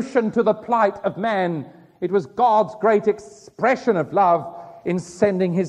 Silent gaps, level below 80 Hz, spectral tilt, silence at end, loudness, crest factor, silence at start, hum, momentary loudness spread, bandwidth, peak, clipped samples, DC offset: none; -64 dBFS; -7 dB/octave; 0 s; -20 LUFS; 16 dB; 0 s; none; 12 LU; 10 kHz; -4 dBFS; under 0.1%; under 0.1%